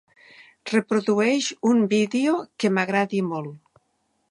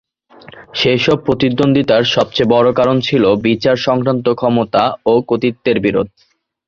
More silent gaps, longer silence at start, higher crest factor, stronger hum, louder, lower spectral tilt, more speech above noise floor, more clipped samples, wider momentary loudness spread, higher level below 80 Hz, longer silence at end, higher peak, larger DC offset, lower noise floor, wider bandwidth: neither; about the same, 0.65 s vs 0.55 s; about the same, 18 dB vs 14 dB; neither; second, -22 LUFS vs -14 LUFS; second, -5 dB/octave vs -6.5 dB/octave; first, 49 dB vs 28 dB; neither; first, 9 LU vs 4 LU; second, -74 dBFS vs -46 dBFS; first, 0.75 s vs 0.6 s; second, -6 dBFS vs 0 dBFS; neither; first, -71 dBFS vs -42 dBFS; first, 11 kHz vs 7.4 kHz